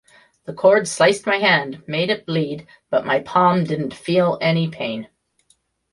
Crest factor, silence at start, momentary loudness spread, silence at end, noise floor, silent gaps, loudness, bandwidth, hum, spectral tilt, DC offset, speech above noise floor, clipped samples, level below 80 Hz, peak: 18 dB; 0.5 s; 11 LU; 0.85 s; -63 dBFS; none; -19 LUFS; 11.5 kHz; none; -5 dB/octave; under 0.1%; 44 dB; under 0.1%; -62 dBFS; -2 dBFS